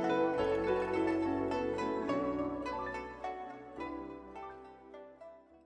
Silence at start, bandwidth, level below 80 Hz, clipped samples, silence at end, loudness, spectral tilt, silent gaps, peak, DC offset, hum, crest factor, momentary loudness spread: 0 s; 9.8 kHz; -60 dBFS; under 0.1%; 0.1 s; -35 LUFS; -6.5 dB/octave; none; -20 dBFS; under 0.1%; none; 16 dB; 20 LU